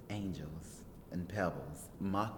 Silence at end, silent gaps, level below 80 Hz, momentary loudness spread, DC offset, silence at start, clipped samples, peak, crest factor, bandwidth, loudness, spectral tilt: 0 s; none; -58 dBFS; 13 LU; under 0.1%; 0 s; under 0.1%; -22 dBFS; 20 dB; 19.5 kHz; -41 LUFS; -6.5 dB/octave